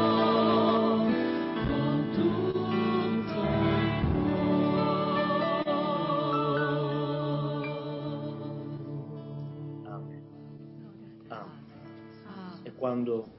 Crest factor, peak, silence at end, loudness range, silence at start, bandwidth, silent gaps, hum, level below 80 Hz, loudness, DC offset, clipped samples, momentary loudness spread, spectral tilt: 14 dB; -14 dBFS; 0 s; 15 LU; 0 s; 5.8 kHz; none; none; -50 dBFS; -28 LUFS; under 0.1%; under 0.1%; 21 LU; -11 dB/octave